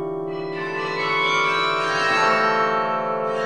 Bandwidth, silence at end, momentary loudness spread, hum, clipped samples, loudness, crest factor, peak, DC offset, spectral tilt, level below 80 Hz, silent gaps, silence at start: 11.5 kHz; 0 s; 10 LU; none; under 0.1%; -20 LUFS; 16 dB; -6 dBFS; 0.4%; -3.5 dB/octave; -62 dBFS; none; 0 s